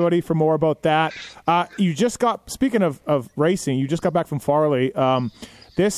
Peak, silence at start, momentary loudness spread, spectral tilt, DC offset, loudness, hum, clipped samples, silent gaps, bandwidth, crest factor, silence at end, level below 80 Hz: -6 dBFS; 0 s; 5 LU; -6 dB/octave; under 0.1%; -21 LUFS; none; under 0.1%; none; 15.5 kHz; 14 dB; 0 s; -54 dBFS